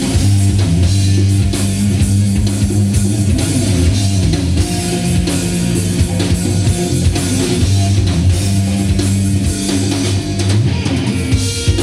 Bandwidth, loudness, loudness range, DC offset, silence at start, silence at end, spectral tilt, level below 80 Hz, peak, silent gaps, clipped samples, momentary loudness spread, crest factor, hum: 14 kHz; -14 LUFS; 1 LU; under 0.1%; 0 s; 0 s; -5.5 dB/octave; -24 dBFS; -2 dBFS; none; under 0.1%; 3 LU; 12 dB; none